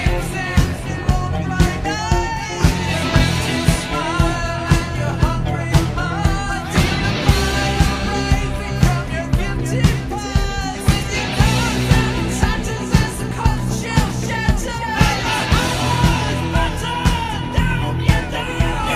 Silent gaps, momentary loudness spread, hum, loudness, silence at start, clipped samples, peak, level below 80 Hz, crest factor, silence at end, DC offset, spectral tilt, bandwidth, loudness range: none; 5 LU; none; -19 LUFS; 0 s; under 0.1%; 0 dBFS; -24 dBFS; 18 dB; 0 s; under 0.1%; -5 dB/octave; 15.5 kHz; 1 LU